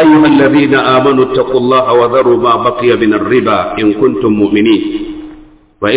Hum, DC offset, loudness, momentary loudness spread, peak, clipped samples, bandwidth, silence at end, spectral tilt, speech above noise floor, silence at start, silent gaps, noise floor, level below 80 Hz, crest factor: none; under 0.1%; -9 LUFS; 6 LU; 0 dBFS; under 0.1%; 4 kHz; 0 s; -10 dB/octave; 28 dB; 0 s; none; -37 dBFS; -42 dBFS; 10 dB